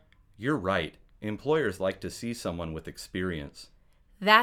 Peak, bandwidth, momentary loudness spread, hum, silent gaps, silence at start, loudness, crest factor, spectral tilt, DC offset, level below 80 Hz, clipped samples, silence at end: -2 dBFS; 17.5 kHz; 12 LU; none; none; 0.4 s; -31 LUFS; 28 dB; -5 dB/octave; under 0.1%; -54 dBFS; under 0.1%; 0 s